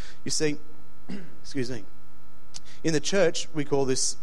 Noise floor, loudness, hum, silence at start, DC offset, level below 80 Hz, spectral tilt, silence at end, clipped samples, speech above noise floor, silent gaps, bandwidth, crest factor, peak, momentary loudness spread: -55 dBFS; -27 LUFS; none; 0 s; 7%; -54 dBFS; -3.5 dB/octave; 0.1 s; under 0.1%; 27 dB; none; 16 kHz; 20 dB; -8 dBFS; 17 LU